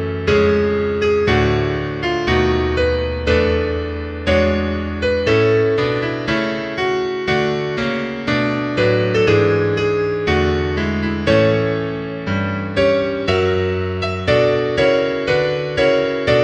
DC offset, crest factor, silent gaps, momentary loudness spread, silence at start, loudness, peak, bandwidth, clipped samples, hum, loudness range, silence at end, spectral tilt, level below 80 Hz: under 0.1%; 16 dB; none; 6 LU; 0 s; -17 LUFS; -2 dBFS; 9 kHz; under 0.1%; none; 1 LU; 0 s; -6.5 dB/octave; -32 dBFS